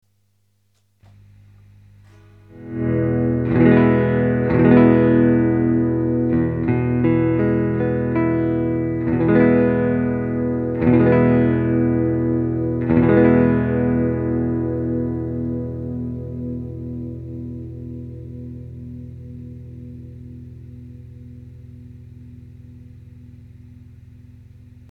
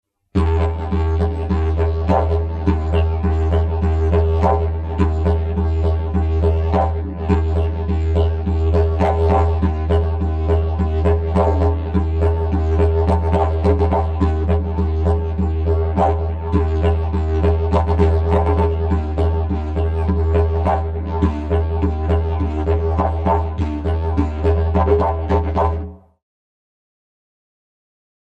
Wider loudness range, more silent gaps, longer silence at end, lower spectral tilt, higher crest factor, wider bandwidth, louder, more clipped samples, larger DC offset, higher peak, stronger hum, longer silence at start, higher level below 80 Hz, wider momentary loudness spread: first, 20 LU vs 2 LU; neither; second, 0.5 s vs 2.25 s; first, -11.5 dB/octave vs -9.5 dB/octave; first, 20 dB vs 14 dB; second, 4.2 kHz vs 4.7 kHz; about the same, -18 LUFS vs -18 LUFS; neither; neither; about the same, 0 dBFS vs -2 dBFS; first, 50 Hz at -45 dBFS vs none; first, 2.55 s vs 0.35 s; second, -40 dBFS vs -22 dBFS; first, 23 LU vs 4 LU